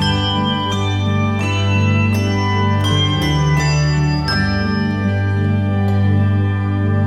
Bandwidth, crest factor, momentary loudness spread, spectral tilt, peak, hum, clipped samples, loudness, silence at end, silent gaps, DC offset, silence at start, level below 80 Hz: 11 kHz; 12 dB; 3 LU; -6 dB/octave; -4 dBFS; none; under 0.1%; -16 LUFS; 0 s; none; under 0.1%; 0 s; -32 dBFS